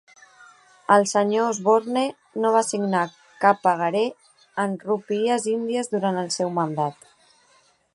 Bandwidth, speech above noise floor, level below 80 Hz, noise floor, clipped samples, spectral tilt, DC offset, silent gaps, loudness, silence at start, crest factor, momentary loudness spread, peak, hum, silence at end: 11.5 kHz; 38 dB; -76 dBFS; -60 dBFS; under 0.1%; -4.5 dB/octave; under 0.1%; none; -23 LUFS; 0.9 s; 22 dB; 9 LU; -2 dBFS; none; 1 s